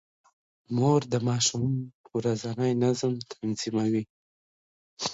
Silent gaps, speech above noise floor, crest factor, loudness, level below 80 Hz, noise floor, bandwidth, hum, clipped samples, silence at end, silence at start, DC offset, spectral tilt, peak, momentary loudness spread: 1.94-2.04 s, 4.10-4.97 s; over 63 dB; 18 dB; -28 LUFS; -64 dBFS; under -90 dBFS; 8 kHz; none; under 0.1%; 0 s; 0.7 s; under 0.1%; -5 dB/octave; -10 dBFS; 9 LU